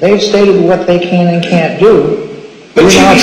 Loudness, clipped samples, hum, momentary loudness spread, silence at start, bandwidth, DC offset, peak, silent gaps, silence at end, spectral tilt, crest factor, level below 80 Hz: -8 LUFS; 0.5%; none; 10 LU; 0 s; 15.5 kHz; under 0.1%; 0 dBFS; none; 0 s; -5 dB/octave; 8 dB; -38 dBFS